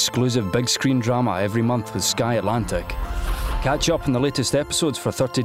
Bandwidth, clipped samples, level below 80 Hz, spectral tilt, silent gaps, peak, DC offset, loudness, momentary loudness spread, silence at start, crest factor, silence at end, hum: 16 kHz; under 0.1%; -32 dBFS; -4.5 dB/octave; none; -10 dBFS; under 0.1%; -22 LUFS; 7 LU; 0 s; 12 dB; 0 s; none